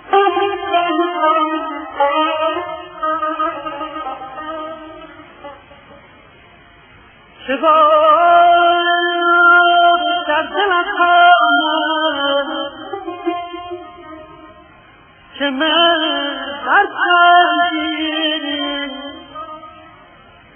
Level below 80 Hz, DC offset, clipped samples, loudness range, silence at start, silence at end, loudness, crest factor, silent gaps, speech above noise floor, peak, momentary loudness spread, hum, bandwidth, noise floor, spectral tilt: -56 dBFS; under 0.1%; under 0.1%; 14 LU; 0.05 s; 0.75 s; -14 LUFS; 16 dB; none; 32 dB; 0 dBFS; 19 LU; none; 3.5 kHz; -45 dBFS; -5 dB/octave